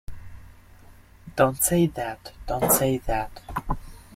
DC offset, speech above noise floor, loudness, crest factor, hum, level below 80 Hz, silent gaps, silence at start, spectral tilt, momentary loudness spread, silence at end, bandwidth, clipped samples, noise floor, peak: under 0.1%; 25 dB; -24 LUFS; 22 dB; none; -40 dBFS; none; 0.1 s; -4.5 dB/octave; 15 LU; 0.15 s; 16.5 kHz; under 0.1%; -49 dBFS; -4 dBFS